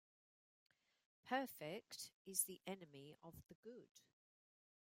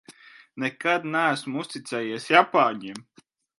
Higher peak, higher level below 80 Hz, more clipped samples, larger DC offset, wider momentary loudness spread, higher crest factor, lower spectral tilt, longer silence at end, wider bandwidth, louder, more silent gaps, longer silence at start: second, -26 dBFS vs 0 dBFS; second, -88 dBFS vs -78 dBFS; neither; neither; about the same, 19 LU vs 18 LU; about the same, 28 dB vs 26 dB; second, -2.5 dB/octave vs -4.5 dB/octave; first, 1 s vs 0.55 s; first, 16 kHz vs 11.5 kHz; second, -47 LUFS vs -24 LUFS; first, 2.13-2.25 s, 3.55-3.63 s, 3.91-3.95 s vs none; first, 1.25 s vs 0.1 s